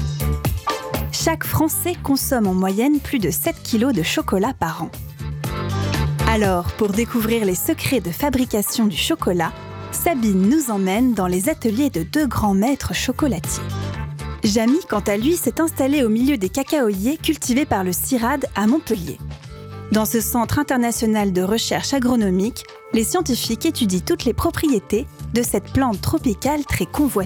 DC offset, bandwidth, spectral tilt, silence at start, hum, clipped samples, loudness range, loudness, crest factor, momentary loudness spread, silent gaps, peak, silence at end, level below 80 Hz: under 0.1%; over 20 kHz; -5 dB/octave; 0 s; none; under 0.1%; 2 LU; -20 LUFS; 16 dB; 7 LU; none; -4 dBFS; 0 s; -36 dBFS